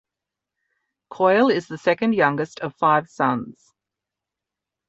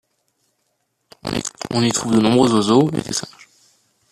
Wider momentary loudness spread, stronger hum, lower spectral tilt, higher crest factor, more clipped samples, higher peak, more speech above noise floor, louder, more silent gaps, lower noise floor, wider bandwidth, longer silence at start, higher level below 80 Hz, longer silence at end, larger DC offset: about the same, 10 LU vs 12 LU; neither; first, -6.5 dB/octave vs -5 dB/octave; about the same, 20 dB vs 18 dB; neither; about the same, -2 dBFS vs -2 dBFS; first, 66 dB vs 54 dB; second, -21 LUFS vs -18 LUFS; neither; first, -86 dBFS vs -70 dBFS; second, 8.2 kHz vs 14 kHz; second, 1.1 s vs 1.25 s; second, -66 dBFS vs -52 dBFS; first, 1.4 s vs 0.85 s; neither